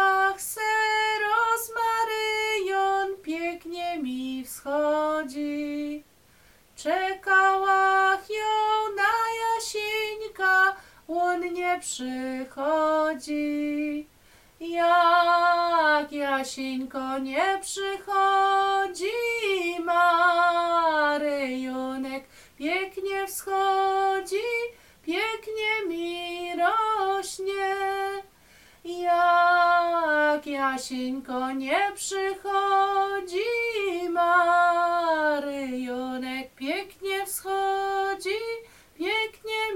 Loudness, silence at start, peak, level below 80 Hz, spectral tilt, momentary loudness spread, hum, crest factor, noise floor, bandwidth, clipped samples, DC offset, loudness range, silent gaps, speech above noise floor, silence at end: -25 LUFS; 0 s; -10 dBFS; -62 dBFS; -1.5 dB/octave; 11 LU; none; 16 dB; -58 dBFS; 16.5 kHz; under 0.1%; under 0.1%; 5 LU; none; 33 dB; 0 s